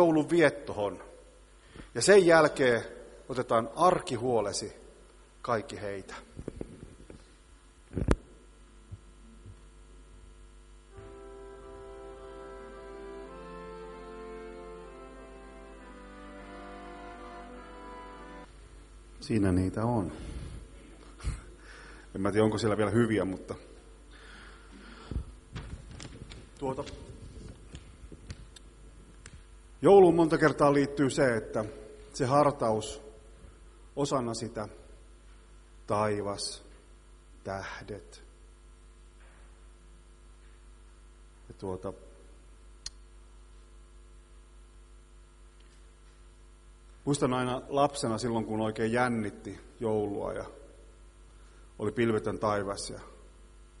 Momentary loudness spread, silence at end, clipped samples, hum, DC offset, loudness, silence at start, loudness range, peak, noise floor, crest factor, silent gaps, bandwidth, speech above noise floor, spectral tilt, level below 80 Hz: 25 LU; 0.15 s; under 0.1%; none; under 0.1%; -29 LUFS; 0 s; 21 LU; -4 dBFS; -56 dBFS; 28 dB; none; 11.5 kHz; 28 dB; -5.5 dB/octave; -50 dBFS